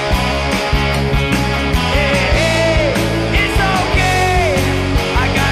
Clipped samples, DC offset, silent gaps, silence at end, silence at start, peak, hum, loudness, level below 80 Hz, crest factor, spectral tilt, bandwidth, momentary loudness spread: under 0.1%; under 0.1%; none; 0 s; 0 s; -4 dBFS; none; -14 LUFS; -20 dBFS; 10 dB; -5 dB/octave; 15 kHz; 3 LU